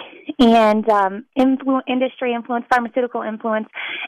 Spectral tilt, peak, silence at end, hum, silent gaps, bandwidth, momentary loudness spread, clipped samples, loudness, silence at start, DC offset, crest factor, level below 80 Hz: -6 dB/octave; -6 dBFS; 0 s; none; none; 12 kHz; 10 LU; under 0.1%; -18 LUFS; 0 s; under 0.1%; 12 dB; -52 dBFS